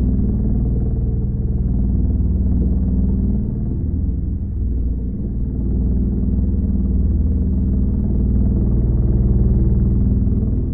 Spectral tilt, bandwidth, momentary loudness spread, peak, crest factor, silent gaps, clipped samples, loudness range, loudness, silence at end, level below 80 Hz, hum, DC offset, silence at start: -16.5 dB/octave; 1.4 kHz; 5 LU; -6 dBFS; 12 dB; none; under 0.1%; 4 LU; -19 LUFS; 0 s; -18 dBFS; none; under 0.1%; 0 s